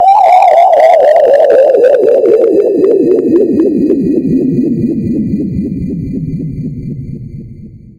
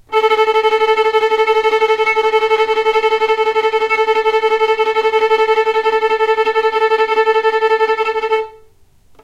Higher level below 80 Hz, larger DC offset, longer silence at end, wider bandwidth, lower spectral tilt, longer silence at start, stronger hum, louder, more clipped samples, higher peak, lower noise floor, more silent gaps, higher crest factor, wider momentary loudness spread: first, -36 dBFS vs -52 dBFS; neither; second, 0.2 s vs 0.7 s; first, 12 kHz vs 9.2 kHz; first, -8.5 dB/octave vs -1.5 dB/octave; about the same, 0 s vs 0.1 s; neither; first, -9 LUFS vs -14 LUFS; first, 1% vs under 0.1%; about the same, 0 dBFS vs -2 dBFS; second, -31 dBFS vs -47 dBFS; neither; about the same, 8 dB vs 12 dB; first, 15 LU vs 2 LU